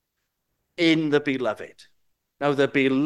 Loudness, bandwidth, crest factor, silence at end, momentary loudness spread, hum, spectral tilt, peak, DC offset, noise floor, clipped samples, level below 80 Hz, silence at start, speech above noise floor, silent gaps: -23 LUFS; 11.5 kHz; 18 dB; 0 s; 16 LU; none; -6 dB/octave; -6 dBFS; under 0.1%; -78 dBFS; under 0.1%; -70 dBFS; 0.8 s; 56 dB; none